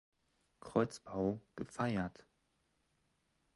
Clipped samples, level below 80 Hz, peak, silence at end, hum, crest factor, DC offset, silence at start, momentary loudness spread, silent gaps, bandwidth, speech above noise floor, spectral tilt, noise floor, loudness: under 0.1%; -66 dBFS; -18 dBFS; 1.45 s; none; 24 dB; under 0.1%; 0.65 s; 10 LU; none; 11.5 kHz; 41 dB; -7 dB/octave; -80 dBFS; -39 LUFS